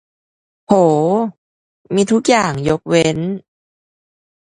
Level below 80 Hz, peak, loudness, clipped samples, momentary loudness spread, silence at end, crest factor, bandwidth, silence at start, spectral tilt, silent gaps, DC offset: -50 dBFS; 0 dBFS; -15 LUFS; under 0.1%; 10 LU; 1.2 s; 18 dB; 11.5 kHz; 0.7 s; -5.5 dB/octave; 1.38-1.85 s; under 0.1%